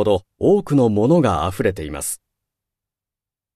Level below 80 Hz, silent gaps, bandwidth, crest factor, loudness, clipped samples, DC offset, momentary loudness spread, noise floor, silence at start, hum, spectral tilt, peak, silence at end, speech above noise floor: -44 dBFS; none; 14 kHz; 16 dB; -18 LUFS; under 0.1%; under 0.1%; 10 LU; -89 dBFS; 0 s; none; -6.5 dB/octave; -4 dBFS; 1.4 s; 71 dB